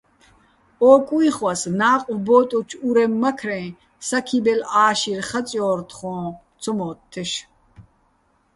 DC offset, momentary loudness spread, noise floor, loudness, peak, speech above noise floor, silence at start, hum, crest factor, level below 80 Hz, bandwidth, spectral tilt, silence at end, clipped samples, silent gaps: under 0.1%; 15 LU; -63 dBFS; -20 LUFS; -2 dBFS; 43 dB; 0.8 s; none; 20 dB; -60 dBFS; 11.5 kHz; -4.5 dB/octave; 0.75 s; under 0.1%; none